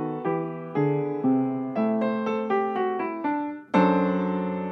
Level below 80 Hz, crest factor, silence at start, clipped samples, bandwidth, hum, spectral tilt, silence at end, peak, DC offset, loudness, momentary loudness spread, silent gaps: -76 dBFS; 18 dB; 0 s; under 0.1%; 6.2 kHz; none; -9 dB/octave; 0 s; -8 dBFS; under 0.1%; -26 LUFS; 7 LU; none